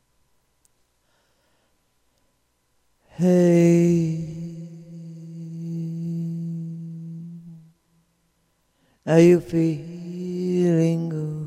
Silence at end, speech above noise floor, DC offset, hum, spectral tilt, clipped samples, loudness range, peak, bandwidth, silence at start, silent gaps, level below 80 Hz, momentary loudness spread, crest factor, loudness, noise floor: 0 s; 51 dB; under 0.1%; none; -8 dB/octave; under 0.1%; 11 LU; -4 dBFS; 9.4 kHz; 3.2 s; none; -62 dBFS; 22 LU; 20 dB; -21 LUFS; -68 dBFS